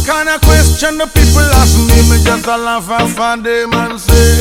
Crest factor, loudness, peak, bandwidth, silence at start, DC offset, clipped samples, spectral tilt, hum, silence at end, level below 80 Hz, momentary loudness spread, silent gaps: 8 dB; -10 LUFS; 0 dBFS; 16.5 kHz; 0 s; under 0.1%; 0.9%; -4.5 dB/octave; none; 0 s; -14 dBFS; 6 LU; none